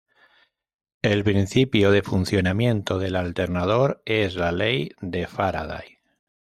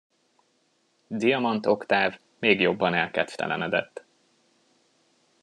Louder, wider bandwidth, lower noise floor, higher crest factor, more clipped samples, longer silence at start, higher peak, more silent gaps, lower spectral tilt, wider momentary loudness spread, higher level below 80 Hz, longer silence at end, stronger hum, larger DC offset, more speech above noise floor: about the same, -23 LUFS vs -25 LUFS; first, 14 kHz vs 11 kHz; second, -63 dBFS vs -69 dBFS; second, 16 dB vs 22 dB; neither; about the same, 1.05 s vs 1.1 s; about the same, -6 dBFS vs -4 dBFS; neither; about the same, -6.5 dB/octave vs -5.5 dB/octave; first, 10 LU vs 7 LU; first, -52 dBFS vs -74 dBFS; second, 0.65 s vs 1.45 s; neither; neither; about the same, 41 dB vs 44 dB